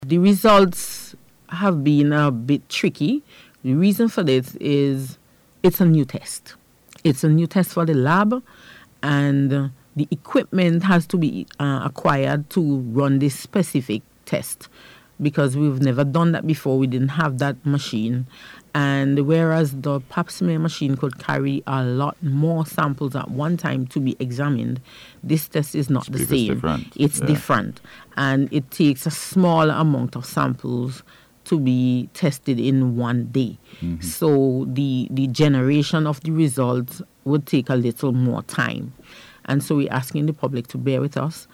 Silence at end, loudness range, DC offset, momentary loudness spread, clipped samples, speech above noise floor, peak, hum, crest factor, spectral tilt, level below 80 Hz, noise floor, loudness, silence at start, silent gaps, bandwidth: 0.1 s; 3 LU; under 0.1%; 10 LU; under 0.1%; 24 dB; -8 dBFS; none; 14 dB; -6.5 dB/octave; -54 dBFS; -43 dBFS; -21 LUFS; 0 s; none; 17 kHz